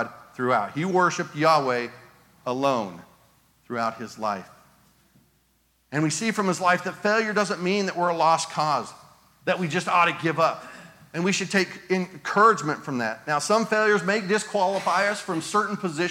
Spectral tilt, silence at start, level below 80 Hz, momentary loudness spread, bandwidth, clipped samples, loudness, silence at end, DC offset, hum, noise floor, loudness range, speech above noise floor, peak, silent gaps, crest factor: -4.5 dB/octave; 0 s; -72 dBFS; 10 LU; 17 kHz; under 0.1%; -24 LUFS; 0 s; under 0.1%; none; -66 dBFS; 8 LU; 42 dB; -4 dBFS; none; 20 dB